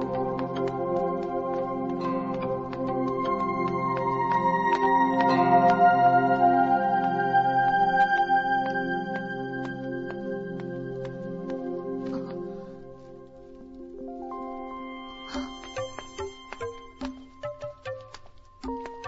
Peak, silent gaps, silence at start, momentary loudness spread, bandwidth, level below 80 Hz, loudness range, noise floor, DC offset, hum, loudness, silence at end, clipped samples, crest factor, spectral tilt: -8 dBFS; none; 0 s; 18 LU; 7.8 kHz; -56 dBFS; 17 LU; -47 dBFS; under 0.1%; none; -26 LUFS; 0 s; under 0.1%; 18 dB; -7 dB/octave